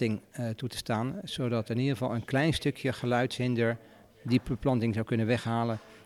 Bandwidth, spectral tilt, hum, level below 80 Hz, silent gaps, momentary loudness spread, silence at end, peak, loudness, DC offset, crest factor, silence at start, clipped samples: 14.5 kHz; -6.5 dB/octave; none; -56 dBFS; none; 7 LU; 0 s; -12 dBFS; -30 LUFS; under 0.1%; 18 dB; 0 s; under 0.1%